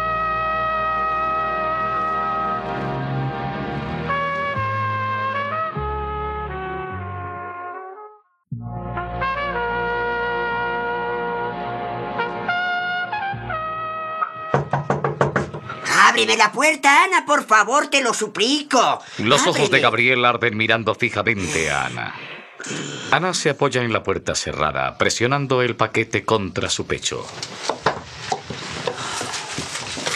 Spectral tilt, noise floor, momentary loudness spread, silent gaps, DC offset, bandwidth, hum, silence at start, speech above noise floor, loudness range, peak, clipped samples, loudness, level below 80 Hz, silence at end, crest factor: -3.5 dB/octave; -45 dBFS; 13 LU; none; under 0.1%; 14 kHz; none; 0 s; 26 dB; 10 LU; 0 dBFS; under 0.1%; -20 LUFS; -46 dBFS; 0 s; 20 dB